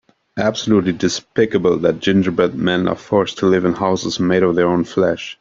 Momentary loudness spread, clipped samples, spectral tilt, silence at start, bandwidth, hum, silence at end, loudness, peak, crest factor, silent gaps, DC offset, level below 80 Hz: 4 LU; under 0.1%; -5.5 dB/octave; 0.35 s; 7.6 kHz; none; 0.1 s; -17 LUFS; 0 dBFS; 16 dB; none; under 0.1%; -52 dBFS